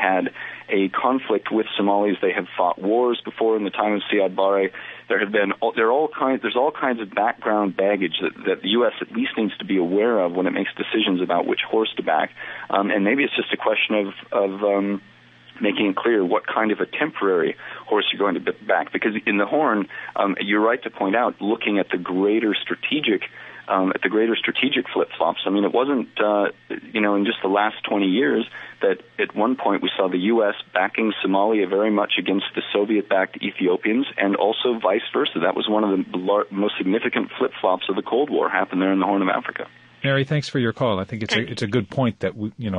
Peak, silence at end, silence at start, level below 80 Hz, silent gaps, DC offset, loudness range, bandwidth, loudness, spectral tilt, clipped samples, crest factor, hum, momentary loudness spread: -4 dBFS; 0 s; 0 s; -62 dBFS; none; under 0.1%; 1 LU; 8.8 kHz; -21 LUFS; -6.5 dB/octave; under 0.1%; 18 dB; none; 5 LU